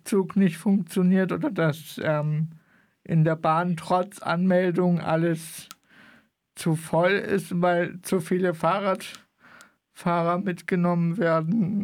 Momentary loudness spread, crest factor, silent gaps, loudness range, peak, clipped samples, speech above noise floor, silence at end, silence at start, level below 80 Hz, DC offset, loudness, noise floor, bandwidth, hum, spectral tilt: 7 LU; 16 dB; none; 2 LU; -10 dBFS; under 0.1%; 34 dB; 0 s; 0.05 s; -68 dBFS; under 0.1%; -24 LUFS; -58 dBFS; 15.5 kHz; none; -7 dB/octave